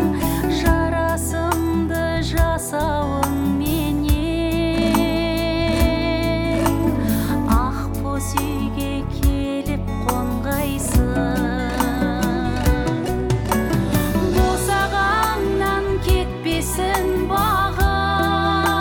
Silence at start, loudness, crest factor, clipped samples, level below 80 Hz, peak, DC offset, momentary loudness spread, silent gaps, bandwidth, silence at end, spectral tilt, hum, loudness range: 0 s; -20 LUFS; 14 dB; under 0.1%; -26 dBFS; -4 dBFS; under 0.1%; 4 LU; none; 19 kHz; 0 s; -5.5 dB/octave; none; 2 LU